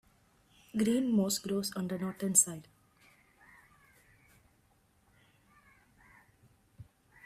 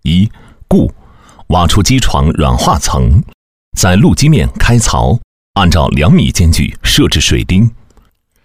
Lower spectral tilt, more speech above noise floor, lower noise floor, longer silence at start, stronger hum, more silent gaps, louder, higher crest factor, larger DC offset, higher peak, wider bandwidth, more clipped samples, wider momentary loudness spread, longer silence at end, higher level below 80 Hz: about the same, -4 dB/octave vs -5 dB/octave; about the same, 38 dB vs 40 dB; first, -69 dBFS vs -48 dBFS; first, 0.75 s vs 0 s; neither; second, none vs 3.34-3.72 s, 5.24-5.54 s; second, -31 LUFS vs -10 LUFS; first, 26 dB vs 10 dB; second, under 0.1% vs 2%; second, -10 dBFS vs 0 dBFS; about the same, 15.5 kHz vs 16.5 kHz; neither; first, 11 LU vs 6 LU; first, 0.45 s vs 0 s; second, -72 dBFS vs -18 dBFS